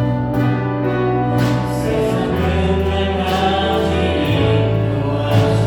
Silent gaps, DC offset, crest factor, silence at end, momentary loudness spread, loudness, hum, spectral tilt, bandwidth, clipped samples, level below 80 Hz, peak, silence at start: none; under 0.1%; 14 dB; 0 s; 3 LU; -17 LUFS; none; -7 dB/octave; 18 kHz; under 0.1%; -32 dBFS; -2 dBFS; 0 s